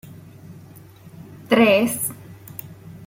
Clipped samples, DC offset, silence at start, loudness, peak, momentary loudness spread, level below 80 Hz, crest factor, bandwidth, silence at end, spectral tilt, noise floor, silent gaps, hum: under 0.1%; under 0.1%; 0.05 s; -18 LUFS; -4 dBFS; 27 LU; -60 dBFS; 20 dB; 16.5 kHz; 0 s; -4 dB/octave; -44 dBFS; none; none